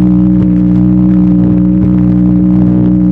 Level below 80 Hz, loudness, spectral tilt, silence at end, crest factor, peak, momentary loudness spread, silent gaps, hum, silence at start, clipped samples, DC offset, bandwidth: -22 dBFS; -8 LUFS; -12.5 dB/octave; 0 s; 6 dB; 0 dBFS; 1 LU; none; 60 Hz at -20 dBFS; 0 s; under 0.1%; under 0.1%; 2.8 kHz